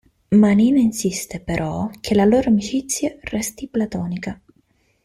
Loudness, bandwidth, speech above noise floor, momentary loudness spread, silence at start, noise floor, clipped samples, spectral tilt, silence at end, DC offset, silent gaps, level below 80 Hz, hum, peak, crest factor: -19 LUFS; 15.5 kHz; 43 dB; 12 LU; 0.3 s; -62 dBFS; under 0.1%; -5.5 dB/octave; 0.7 s; under 0.1%; none; -46 dBFS; none; -4 dBFS; 16 dB